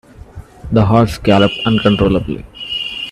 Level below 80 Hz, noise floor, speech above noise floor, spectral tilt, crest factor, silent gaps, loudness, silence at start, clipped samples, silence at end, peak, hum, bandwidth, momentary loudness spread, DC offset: -34 dBFS; -35 dBFS; 23 dB; -7 dB/octave; 14 dB; none; -14 LUFS; 0.35 s; under 0.1%; 0 s; 0 dBFS; none; 13 kHz; 12 LU; under 0.1%